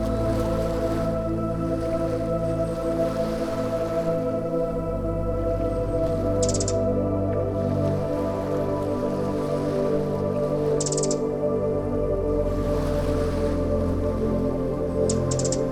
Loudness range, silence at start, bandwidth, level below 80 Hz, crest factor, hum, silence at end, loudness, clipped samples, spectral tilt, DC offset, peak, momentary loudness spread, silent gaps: 1 LU; 0 s; 14 kHz; -36 dBFS; 16 dB; none; 0 s; -25 LUFS; under 0.1%; -6.5 dB/octave; under 0.1%; -8 dBFS; 3 LU; none